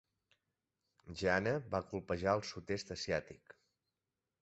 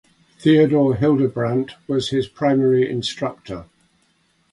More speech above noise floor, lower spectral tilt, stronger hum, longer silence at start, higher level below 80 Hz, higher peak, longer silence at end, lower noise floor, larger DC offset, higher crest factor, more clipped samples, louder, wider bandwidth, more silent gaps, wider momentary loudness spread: first, over 52 dB vs 44 dB; second, -4 dB/octave vs -7 dB/octave; neither; first, 1.05 s vs 0.4 s; second, -62 dBFS vs -52 dBFS; second, -18 dBFS vs -4 dBFS; first, 1.1 s vs 0.9 s; first, under -90 dBFS vs -63 dBFS; neither; first, 22 dB vs 16 dB; neither; second, -38 LUFS vs -19 LUFS; second, 8 kHz vs 11 kHz; neither; about the same, 12 LU vs 12 LU